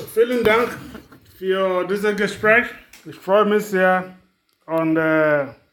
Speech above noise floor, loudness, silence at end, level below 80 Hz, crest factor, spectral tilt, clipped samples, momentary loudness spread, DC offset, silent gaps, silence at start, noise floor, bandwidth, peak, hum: 23 dB; -19 LUFS; 0.2 s; -56 dBFS; 18 dB; -5.5 dB/octave; under 0.1%; 15 LU; under 0.1%; none; 0 s; -42 dBFS; 19 kHz; -2 dBFS; none